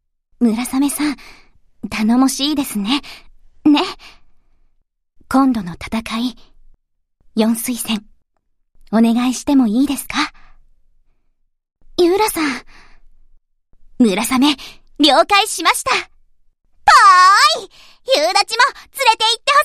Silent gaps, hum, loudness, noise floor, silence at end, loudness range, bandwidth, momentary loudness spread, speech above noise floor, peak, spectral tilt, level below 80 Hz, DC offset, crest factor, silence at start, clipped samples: none; none; -15 LUFS; -64 dBFS; 0 s; 10 LU; 15.5 kHz; 14 LU; 49 dB; 0 dBFS; -3 dB/octave; -46 dBFS; under 0.1%; 18 dB; 0.4 s; under 0.1%